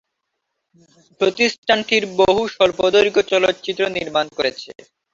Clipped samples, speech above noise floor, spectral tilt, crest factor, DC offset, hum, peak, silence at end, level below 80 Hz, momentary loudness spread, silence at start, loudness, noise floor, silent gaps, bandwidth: under 0.1%; 58 dB; -3.5 dB/octave; 18 dB; under 0.1%; none; -2 dBFS; 0.4 s; -54 dBFS; 7 LU; 1.2 s; -18 LUFS; -76 dBFS; 1.58-1.63 s; 7.8 kHz